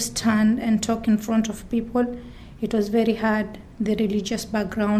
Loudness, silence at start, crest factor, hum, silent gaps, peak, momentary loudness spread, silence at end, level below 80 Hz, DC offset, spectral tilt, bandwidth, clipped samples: -23 LUFS; 0 s; 14 dB; none; none; -8 dBFS; 8 LU; 0 s; -46 dBFS; under 0.1%; -5 dB/octave; 14.5 kHz; under 0.1%